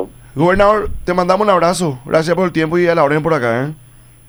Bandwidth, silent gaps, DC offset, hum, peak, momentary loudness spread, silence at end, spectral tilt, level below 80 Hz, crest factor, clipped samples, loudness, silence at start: over 20 kHz; none; under 0.1%; none; 0 dBFS; 7 LU; 0.55 s; -6 dB/octave; -34 dBFS; 14 dB; under 0.1%; -14 LUFS; 0 s